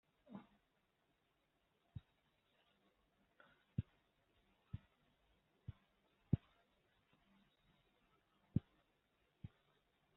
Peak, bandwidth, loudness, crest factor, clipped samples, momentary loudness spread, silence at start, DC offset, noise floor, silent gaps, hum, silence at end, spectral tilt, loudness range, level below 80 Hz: -22 dBFS; 3.9 kHz; -48 LUFS; 32 dB; under 0.1%; 17 LU; 0.3 s; under 0.1%; -83 dBFS; none; none; 0.7 s; -11 dB/octave; 15 LU; -70 dBFS